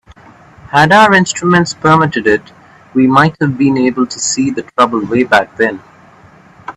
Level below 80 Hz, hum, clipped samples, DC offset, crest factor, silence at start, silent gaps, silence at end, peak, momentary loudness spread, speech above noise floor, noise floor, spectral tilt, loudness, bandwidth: -48 dBFS; none; under 0.1%; under 0.1%; 12 dB; 0.65 s; none; 0.05 s; 0 dBFS; 8 LU; 31 dB; -41 dBFS; -4.5 dB/octave; -11 LUFS; 12 kHz